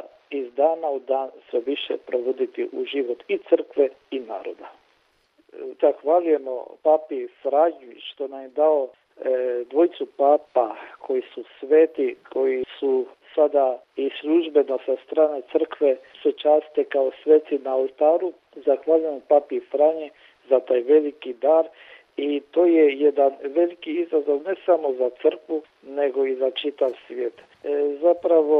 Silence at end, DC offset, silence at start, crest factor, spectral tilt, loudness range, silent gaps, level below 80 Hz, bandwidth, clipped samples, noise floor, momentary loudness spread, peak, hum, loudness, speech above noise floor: 0 s; under 0.1%; 0.3 s; 18 dB; -6 dB/octave; 4 LU; none; -76 dBFS; 4.2 kHz; under 0.1%; -64 dBFS; 12 LU; -4 dBFS; none; -22 LUFS; 42 dB